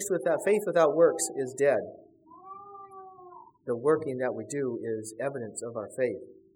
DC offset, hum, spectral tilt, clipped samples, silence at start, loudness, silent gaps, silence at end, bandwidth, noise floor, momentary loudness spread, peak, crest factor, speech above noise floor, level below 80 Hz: under 0.1%; none; -4.5 dB/octave; under 0.1%; 0 s; -28 LUFS; none; 0.2 s; 17 kHz; -51 dBFS; 22 LU; -10 dBFS; 20 dB; 23 dB; -78 dBFS